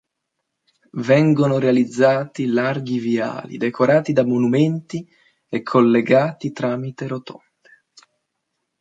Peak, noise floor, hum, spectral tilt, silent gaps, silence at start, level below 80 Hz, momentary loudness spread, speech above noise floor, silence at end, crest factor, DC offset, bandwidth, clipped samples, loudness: -2 dBFS; -77 dBFS; none; -7.5 dB/octave; none; 0.95 s; -66 dBFS; 13 LU; 59 dB; 1.5 s; 16 dB; under 0.1%; 7.8 kHz; under 0.1%; -19 LUFS